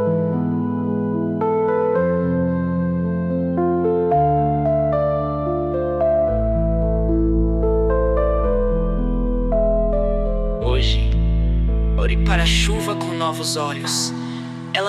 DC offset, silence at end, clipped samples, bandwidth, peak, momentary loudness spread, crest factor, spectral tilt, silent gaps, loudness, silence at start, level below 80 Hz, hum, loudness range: under 0.1%; 0 s; under 0.1%; 13.5 kHz; -4 dBFS; 5 LU; 14 dB; -6 dB/octave; none; -20 LUFS; 0 s; -24 dBFS; none; 1 LU